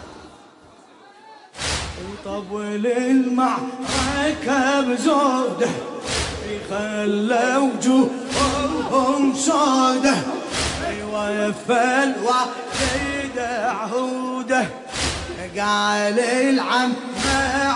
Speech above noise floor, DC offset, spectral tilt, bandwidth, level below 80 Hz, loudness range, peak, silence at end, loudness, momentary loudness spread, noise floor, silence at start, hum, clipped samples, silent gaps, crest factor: 28 dB; under 0.1%; -3.5 dB/octave; 11 kHz; -42 dBFS; 4 LU; -6 dBFS; 0 s; -21 LUFS; 9 LU; -48 dBFS; 0 s; none; under 0.1%; none; 14 dB